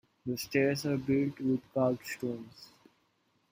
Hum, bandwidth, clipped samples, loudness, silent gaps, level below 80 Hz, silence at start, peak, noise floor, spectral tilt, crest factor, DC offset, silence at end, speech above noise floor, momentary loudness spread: none; 16 kHz; under 0.1%; -32 LUFS; none; -68 dBFS; 0.25 s; -14 dBFS; -74 dBFS; -6 dB/octave; 20 dB; under 0.1%; 0.85 s; 42 dB; 10 LU